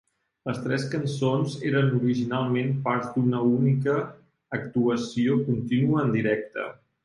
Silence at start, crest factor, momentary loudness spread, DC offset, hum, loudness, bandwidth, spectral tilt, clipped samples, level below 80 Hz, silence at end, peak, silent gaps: 0.45 s; 16 dB; 11 LU; under 0.1%; none; -25 LUFS; 11 kHz; -7.5 dB/octave; under 0.1%; -62 dBFS; 0.3 s; -10 dBFS; none